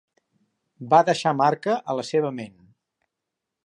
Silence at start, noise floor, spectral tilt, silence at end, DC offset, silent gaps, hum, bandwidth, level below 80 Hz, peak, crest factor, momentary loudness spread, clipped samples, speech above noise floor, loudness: 0.8 s; -84 dBFS; -5.5 dB/octave; 1.15 s; under 0.1%; none; none; 11 kHz; -74 dBFS; -4 dBFS; 20 dB; 19 LU; under 0.1%; 62 dB; -22 LUFS